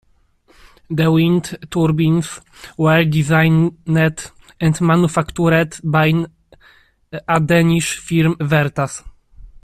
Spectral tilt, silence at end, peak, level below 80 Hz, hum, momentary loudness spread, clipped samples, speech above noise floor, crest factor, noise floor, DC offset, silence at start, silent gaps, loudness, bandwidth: -6 dB/octave; 0.15 s; -2 dBFS; -44 dBFS; none; 15 LU; under 0.1%; 40 dB; 14 dB; -55 dBFS; under 0.1%; 0.9 s; none; -16 LUFS; 14.5 kHz